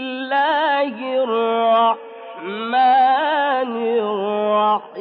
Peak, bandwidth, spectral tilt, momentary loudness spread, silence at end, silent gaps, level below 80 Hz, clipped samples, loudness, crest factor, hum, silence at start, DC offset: -6 dBFS; 5 kHz; -7 dB/octave; 9 LU; 0 s; none; under -90 dBFS; under 0.1%; -18 LUFS; 12 dB; none; 0 s; under 0.1%